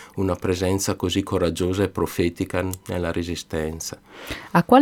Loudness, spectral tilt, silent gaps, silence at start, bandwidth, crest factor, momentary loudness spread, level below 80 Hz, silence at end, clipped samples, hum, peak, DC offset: -24 LUFS; -5.5 dB/octave; none; 0 s; 19 kHz; 20 dB; 9 LU; -44 dBFS; 0 s; under 0.1%; none; -2 dBFS; under 0.1%